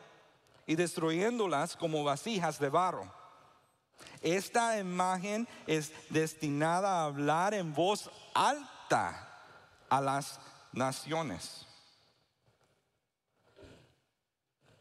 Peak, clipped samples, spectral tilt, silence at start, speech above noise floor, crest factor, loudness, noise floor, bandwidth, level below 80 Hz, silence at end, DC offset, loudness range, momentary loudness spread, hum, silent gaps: -16 dBFS; under 0.1%; -4.5 dB/octave; 0 s; 53 dB; 18 dB; -33 LUFS; -86 dBFS; 15.5 kHz; -76 dBFS; 1.05 s; under 0.1%; 9 LU; 13 LU; none; none